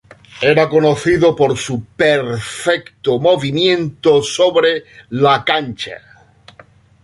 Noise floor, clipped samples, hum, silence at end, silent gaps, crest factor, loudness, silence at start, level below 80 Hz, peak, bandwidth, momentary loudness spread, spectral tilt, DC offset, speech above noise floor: -46 dBFS; under 0.1%; none; 1.05 s; none; 14 dB; -15 LUFS; 0.35 s; -48 dBFS; 0 dBFS; 11.5 kHz; 11 LU; -5 dB/octave; under 0.1%; 31 dB